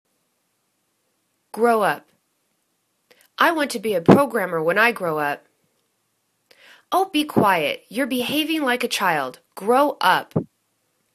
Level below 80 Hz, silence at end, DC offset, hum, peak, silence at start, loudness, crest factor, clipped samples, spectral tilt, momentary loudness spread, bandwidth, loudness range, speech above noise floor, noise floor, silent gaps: -64 dBFS; 0.7 s; under 0.1%; none; 0 dBFS; 1.55 s; -20 LUFS; 22 dB; under 0.1%; -5 dB/octave; 12 LU; 14 kHz; 4 LU; 51 dB; -71 dBFS; none